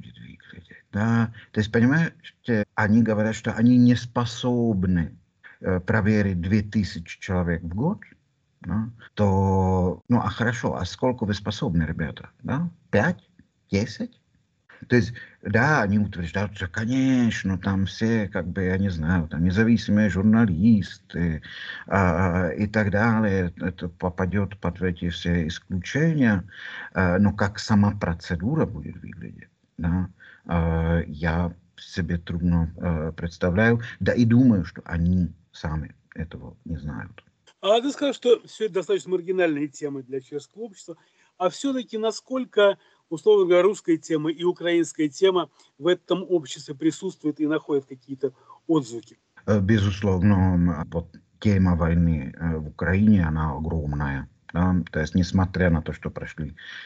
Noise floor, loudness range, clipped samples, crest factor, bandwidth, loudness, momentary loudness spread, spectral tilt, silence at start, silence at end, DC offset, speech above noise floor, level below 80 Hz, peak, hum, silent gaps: -61 dBFS; 5 LU; under 0.1%; 18 dB; 8.6 kHz; -24 LUFS; 14 LU; -7 dB/octave; 0.05 s; 0 s; under 0.1%; 38 dB; -42 dBFS; -6 dBFS; none; none